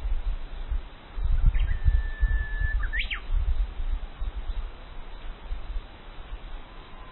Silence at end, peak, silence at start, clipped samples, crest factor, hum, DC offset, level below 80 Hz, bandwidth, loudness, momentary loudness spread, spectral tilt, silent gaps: 0 s; -10 dBFS; 0 s; under 0.1%; 18 dB; none; under 0.1%; -28 dBFS; 4.2 kHz; -32 LUFS; 17 LU; -9 dB/octave; none